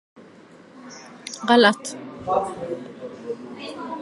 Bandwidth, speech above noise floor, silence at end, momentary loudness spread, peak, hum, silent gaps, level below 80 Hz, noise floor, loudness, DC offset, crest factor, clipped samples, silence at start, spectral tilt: 11.5 kHz; 27 dB; 0 s; 25 LU; -2 dBFS; none; none; -64 dBFS; -48 dBFS; -23 LUFS; under 0.1%; 24 dB; under 0.1%; 0.15 s; -3.5 dB/octave